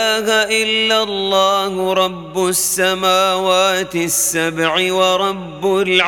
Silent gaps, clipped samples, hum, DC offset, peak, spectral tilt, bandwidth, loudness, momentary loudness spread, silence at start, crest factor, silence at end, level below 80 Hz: none; under 0.1%; none; under 0.1%; 0 dBFS; -2 dB/octave; 18.5 kHz; -15 LUFS; 4 LU; 0 s; 16 dB; 0 s; -52 dBFS